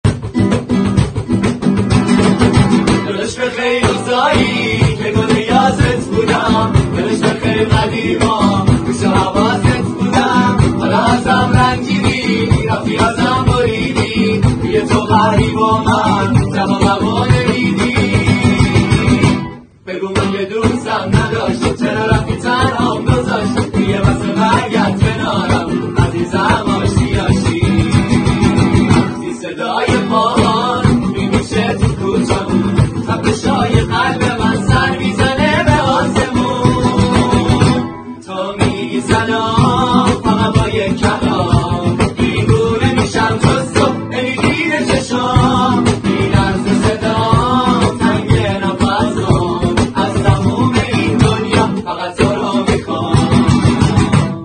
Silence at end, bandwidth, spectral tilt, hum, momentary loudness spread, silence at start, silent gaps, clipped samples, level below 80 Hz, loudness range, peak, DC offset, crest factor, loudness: 0 s; 10 kHz; -6 dB/octave; none; 4 LU; 0.05 s; none; under 0.1%; -28 dBFS; 2 LU; 0 dBFS; under 0.1%; 12 dB; -13 LUFS